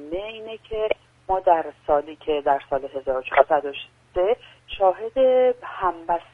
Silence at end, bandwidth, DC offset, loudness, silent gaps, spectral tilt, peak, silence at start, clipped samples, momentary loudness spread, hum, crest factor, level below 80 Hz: 0.1 s; 3.9 kHz; under 0.1%; -23 LUFS; none; -6.5 dB/octave; 0 dBFS; 0 s; under 0.1%; 13 LU; none; 22 dB; -48 dBFS